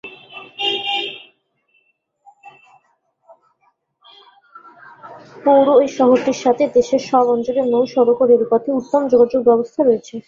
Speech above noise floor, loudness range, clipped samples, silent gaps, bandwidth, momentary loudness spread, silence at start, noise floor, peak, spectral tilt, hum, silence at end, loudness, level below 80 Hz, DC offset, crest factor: 49 dB; 11 LU; under 0.1%; none; 7.4 kHz; 9 LU; 0.05 s; -63 dBFS; -2 dBFS; -4.5 dB/octave; none; 0.05 s; -16 LUFS; -60 dBFS; under 0.1%; 16 dB